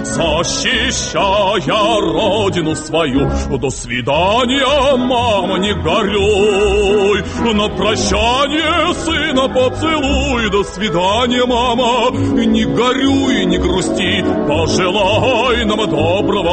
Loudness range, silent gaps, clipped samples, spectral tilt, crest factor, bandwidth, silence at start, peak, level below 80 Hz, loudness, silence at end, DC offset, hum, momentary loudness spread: 1 LU; none; under 0.1%; -4.5 dB/octave; 12 dB; 8.8 kHz; 0 s; -2 dBFS; -30 dBFS; -14 LUFS; 0 s; under 0.1%; none; 3 LU